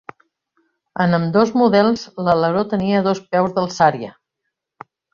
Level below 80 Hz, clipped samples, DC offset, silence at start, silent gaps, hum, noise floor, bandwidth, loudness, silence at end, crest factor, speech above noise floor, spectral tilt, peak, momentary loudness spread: -56 dBFS; under 0.1%; under 0.1%; 0.95 s; none; none; -78 dBFS; 7.4 kHz; -17 LUFS; 1.05 s; 18 dB; 62 dB; -6.5 dB/octave; -2 dBFS; 7 LU